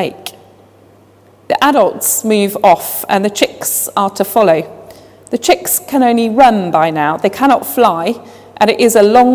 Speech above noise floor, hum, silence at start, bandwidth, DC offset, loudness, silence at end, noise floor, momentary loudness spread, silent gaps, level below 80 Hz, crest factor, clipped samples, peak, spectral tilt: 34 dB; none; 0 s; 16 kHz; under 0.1%; -12 LUFS; 0 s; -45 dBFS; 9 LU; none; -52 dBFS; 12 dB; 0.4%; 0 dBFS; -3.5 dB/octave